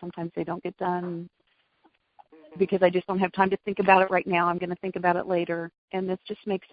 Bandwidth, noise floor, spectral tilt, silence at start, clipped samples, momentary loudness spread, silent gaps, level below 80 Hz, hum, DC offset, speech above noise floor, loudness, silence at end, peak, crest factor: 5 kHz; -66 dBFS; -10.5 dB/octave; 0 s; under 0.1%; 13 LU; 5.78-5.88 s; -66 dBFS; none; under 0.1%; 40 dB; -26 LUFS; 0.15 s; -2 dBFS; 24 dB